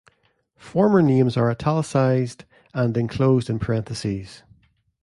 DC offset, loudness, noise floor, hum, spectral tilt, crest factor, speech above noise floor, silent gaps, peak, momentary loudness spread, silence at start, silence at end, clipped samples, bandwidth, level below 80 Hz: under 0.1%; -21 LUFS; -66 dBFS; none; -7.5 dB/octave; 16 dB; 45 dB; none; -6 dBFS; 12 LU; 0.65 s; 0.65 s; under 0.1%; 11.5 kHz; -50 dBFS